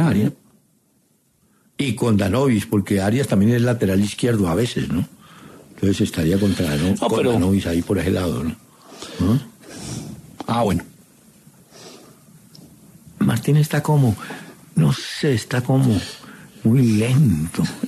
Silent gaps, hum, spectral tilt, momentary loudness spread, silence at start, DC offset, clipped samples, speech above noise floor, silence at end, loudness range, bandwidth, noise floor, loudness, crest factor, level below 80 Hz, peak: none; none; -6.5 dB/octave; 15 LU; 0 s; under 0.1%; under 0.1%; 43 dB; 0 s; 7 LU; 14 kHz; -61 dBFS; -20 LUFS; 14 dB; -48 dBFS; -6 dBFS